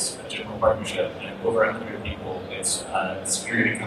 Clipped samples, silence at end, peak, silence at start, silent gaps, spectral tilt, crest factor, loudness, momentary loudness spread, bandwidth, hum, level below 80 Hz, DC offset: under 0.1%; 0 s; -6 dBFS; 0 s; none; -3 dB/octave; 18 dB; -26 LUFS; 10 LU; 14.5 kHz; none; -50 dBFS; under 0.1%